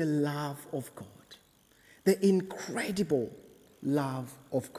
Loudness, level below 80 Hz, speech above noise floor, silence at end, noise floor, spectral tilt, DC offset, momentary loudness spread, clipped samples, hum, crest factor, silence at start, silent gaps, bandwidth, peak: -32 LUFS; -68 dBFS; 31 dB; 0 s; -63 dBFS; -6 dB/octave; under 0.1%; 14 LU; under 0.1%; none; 20 dB; 0 s; none; 16 kHz; -12 dBFS